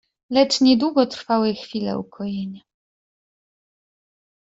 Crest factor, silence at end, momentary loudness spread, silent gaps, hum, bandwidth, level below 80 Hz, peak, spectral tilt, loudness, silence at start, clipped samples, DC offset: 20 dB; 2 s; 13 LU; none; none; 8 kHz; -62 dBFS; -4 dBFS; -5 dB/octave; -21 LUFS; 0.3 s; under 0.1%; under 0.1%